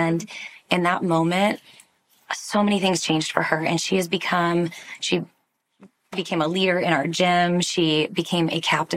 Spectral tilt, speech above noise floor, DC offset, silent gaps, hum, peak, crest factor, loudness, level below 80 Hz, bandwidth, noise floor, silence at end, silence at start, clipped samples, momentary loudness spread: -4.5 dB/octave; 34 dB; under 0.1%; none; none; -2 dBFS; 22 dB; -22 LUFS; -68 dBFS; 15.5 kHz; -56 dBFS; 0 s; 0 s; under 0.1%; 10 LU